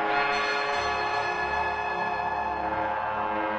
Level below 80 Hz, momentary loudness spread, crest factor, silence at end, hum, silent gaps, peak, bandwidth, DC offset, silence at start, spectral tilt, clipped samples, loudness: -52 dBFS; 4 LU; 14 dB; 0 s; none; none; -14 dBFS; 9 kHz; under 0.1%; 0 s; -3.5 dB/octave; under 0.1%; -27 LUFS